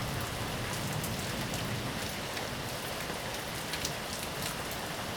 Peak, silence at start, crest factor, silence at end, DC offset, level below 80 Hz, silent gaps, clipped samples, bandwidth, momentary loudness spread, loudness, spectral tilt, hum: -12 dBFS; 0 s; 24 dB; 0 s; under 0.1%; -50 dBFS; none; under 0.1%; over 20 kHz; 2 LU; -35 LUFS; -3.5 dB/octave; none